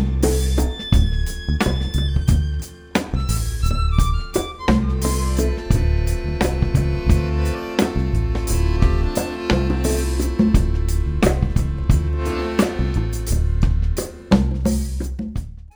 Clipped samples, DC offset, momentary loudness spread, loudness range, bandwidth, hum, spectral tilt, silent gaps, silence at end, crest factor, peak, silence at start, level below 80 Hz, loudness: under 0.1%; under 0.1%; 5 LU; 2 LU; over 20 kHz; none; -6 dB/octave; none; 0.1 s; 16 dB; -2 dBFS; 0 s; -22 dBFS; -21 LUFS